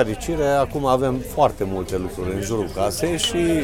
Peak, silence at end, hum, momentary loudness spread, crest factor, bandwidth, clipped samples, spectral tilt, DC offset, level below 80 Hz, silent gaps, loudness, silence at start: -2 dBFS; 0 s; none; 6 LU; 18 dB; 17 kHz; under 0.1%; -5 dB/octave; under 0.1%; -36 dBFS; none; -22 LUFS; 0 s